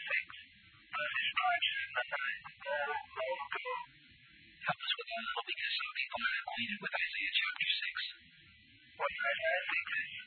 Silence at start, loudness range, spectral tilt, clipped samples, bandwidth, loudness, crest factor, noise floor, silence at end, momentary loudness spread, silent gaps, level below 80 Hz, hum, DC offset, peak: 0 s; 4 LU; -4.5 dB/octave; under 0.1%; 4.6 kHz; -36 LUFS; 20 dB; -62 dBFS; 0 s; 9 LU; none; -76 dBFS; none; under 0.1%; -20 dBFS